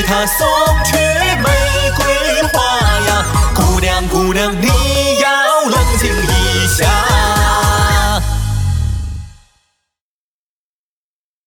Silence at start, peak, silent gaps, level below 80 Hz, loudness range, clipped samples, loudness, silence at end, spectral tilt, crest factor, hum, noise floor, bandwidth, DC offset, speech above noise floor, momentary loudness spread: 0 s; 0 dBFS; none; -20 dBFS; 5 LU; under 0.1%; -12 LUFS; 2.15 s; -4 dB/octave; 12 dB; none; under -90 dBFS; 19 kHz; under 0.1%; over 78 dB; 5 LU